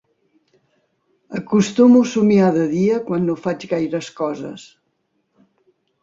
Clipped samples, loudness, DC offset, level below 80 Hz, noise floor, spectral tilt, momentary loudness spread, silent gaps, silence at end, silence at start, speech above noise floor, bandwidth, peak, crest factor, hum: under 0.1%; -17 LUFS; under 0.1%; -62 dBFS; -69 dBFS; -7 dB/octave; 18 LU; none; 1.4 s; 1.3 s; 52 dB; 7.8 kHz; -2 dBFS; 16 dB; none